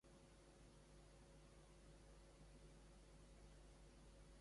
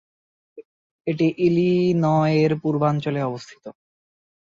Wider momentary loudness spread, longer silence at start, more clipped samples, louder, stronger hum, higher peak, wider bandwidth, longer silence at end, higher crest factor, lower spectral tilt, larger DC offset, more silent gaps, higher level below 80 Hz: second, 1 LU vs 14 LU; second, 0.05 s vs 0.55 s; neither; second, -68 LUFS vs -21 LUFS; neither; second, -54 dBFS vs -6 dBFS; first, 11.5 kHz vs 7.4 kHz; second, 0 s vs 0.7 s; about the same, 12 dB vs 16 dB; second, -5 dB/octave vs -8.5 dB/octave; neither; second, none vs 0.65-1.05 s; second, -68 dBFS vs -62 dBFS